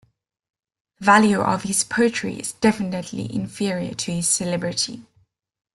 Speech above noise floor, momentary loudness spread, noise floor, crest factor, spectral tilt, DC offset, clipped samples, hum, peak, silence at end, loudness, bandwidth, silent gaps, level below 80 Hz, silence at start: 42 dB; 13 LU; -64 dBFS; 20 dB; -3.5 dB/octave; under 0.1%; under 0.1%; none; -2 dBFS; 0.7 s; -21 LUFS; 12.5 kHz; none; -58 dBFS; 1 s